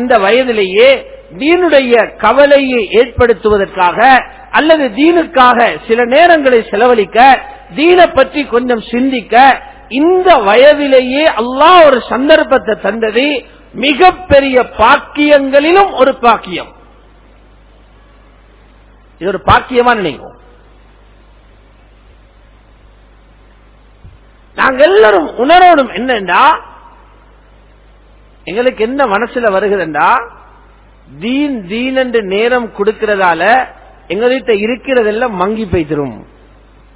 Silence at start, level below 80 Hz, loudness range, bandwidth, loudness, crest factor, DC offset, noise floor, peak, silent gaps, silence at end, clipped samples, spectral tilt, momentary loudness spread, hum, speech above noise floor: 0 s; -38 dBFS; 7 LU; 4 kHz; -9 LUFS; 10 dB; under 0.1%; -42 dBFS; 0 dBFS; none; 0.75 s; 3%; -8.5 dB/octave; 9 LU; none; 33 dB